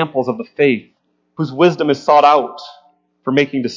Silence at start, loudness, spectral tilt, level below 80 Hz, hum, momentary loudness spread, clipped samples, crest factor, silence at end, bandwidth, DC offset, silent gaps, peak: 0 s; -15 LUFS; -6.5 dB/octave; -66 dBFS; none; 15 LU; under 0.1%; 16 dB; 0 s; 7.6 kHz; under 0.1%; none; 0 dBFS